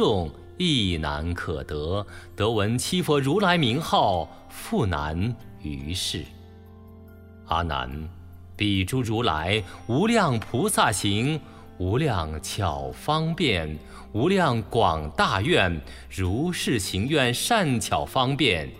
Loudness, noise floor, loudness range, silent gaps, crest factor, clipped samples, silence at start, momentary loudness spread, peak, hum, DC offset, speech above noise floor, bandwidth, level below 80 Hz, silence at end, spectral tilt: -24 LUFS; -46 dBFS; 6 LU; none; 20 dB; under 0.1%; 0 s; 11 LU; -6 dBFS; none; under 0.1%; 21 dB; 16 kHz; -42 dBFS; 0 s; -5 dB/octave